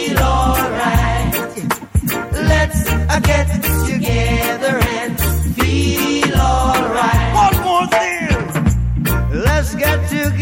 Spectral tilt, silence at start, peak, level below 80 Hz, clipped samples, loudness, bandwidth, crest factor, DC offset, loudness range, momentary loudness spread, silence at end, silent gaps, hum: -5 dB/octave; 0 s; -2 dBFS; -22 dBFS; under 0.1%; -16 LUFS; 17 kHz; 12 dB; under 0.1%; 2 LU; 4 LU; 0 s; none; none